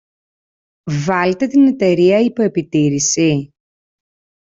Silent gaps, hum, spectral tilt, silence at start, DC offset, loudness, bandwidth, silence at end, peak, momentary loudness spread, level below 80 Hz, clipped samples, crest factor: none; none; -5 dB/octave; 0.85 s; under 0.1%; -15 LUFS; 8 kHz; 1.05 s; -2 dBFS; 9 LU; -56 dBFS; under 0.1%; 14 dB